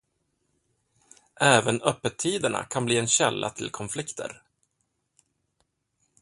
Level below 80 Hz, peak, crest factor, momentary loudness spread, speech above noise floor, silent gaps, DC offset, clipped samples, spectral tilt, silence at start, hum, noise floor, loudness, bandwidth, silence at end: -64 dBFS; -2 dBFS; 26 dB; 14 LU; 51 dB; none; under 0.1%; under 0.1%; -3 dB/octave; 1.4 s; none; -76 dBFS; -25 LUFS; 11.5 kHz; 1.9 s